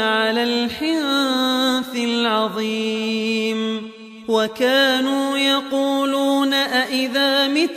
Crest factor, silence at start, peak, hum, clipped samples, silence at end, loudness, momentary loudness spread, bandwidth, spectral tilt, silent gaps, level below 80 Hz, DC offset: 14 dB; 0 s; -6 dBFS; none; under 0.1%; 0 s; -19 LUFS; 5 LU; 15.5 kHz; -3 dB/octave; none; -62 dBFS; under 0.1%